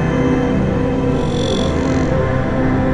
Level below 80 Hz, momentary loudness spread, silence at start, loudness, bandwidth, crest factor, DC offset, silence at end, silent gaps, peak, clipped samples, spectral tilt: -28 dBFS; 2 LU; 0 s; -17 LUFS; 10.5 kHz; 12 dB; under 0.1%; 0 s; none; -4 dBFS; under 0.1%; -7 dB/octave